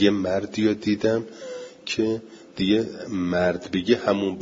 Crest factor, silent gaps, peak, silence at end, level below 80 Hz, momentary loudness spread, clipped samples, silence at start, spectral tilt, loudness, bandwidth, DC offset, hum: 18 dB; none; -6 dBFS; 0 s; -58 dBFS; 14 LU; under 0.1%; 0 s; -6 dB/octave; -24 LUFS; 7.8 kHz; under 0.1%; none